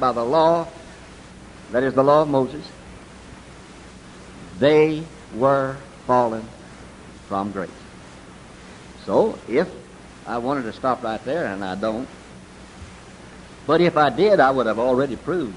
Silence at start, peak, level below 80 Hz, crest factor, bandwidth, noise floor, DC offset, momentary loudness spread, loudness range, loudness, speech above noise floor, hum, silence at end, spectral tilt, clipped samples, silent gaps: 0 s; -2 dBFS; -50 dBFS; 20 dB; 11 kHz; -42 dBFS; under 0.1%; 26 LU; 6 LU; -21 LUFS; 22 dB; none; 0 s; -6.5 dB/octave; under 0.1%; none